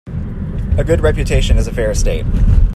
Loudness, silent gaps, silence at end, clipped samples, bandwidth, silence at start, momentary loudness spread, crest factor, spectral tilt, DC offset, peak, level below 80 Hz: -16 LUFS; none; 0 s; under 0.1%; 12.5 kHz; 0.05 s; 9 LU; 12 dB; -6 dB/octave; under 0.1%; 0 dBFS; -16 dBFS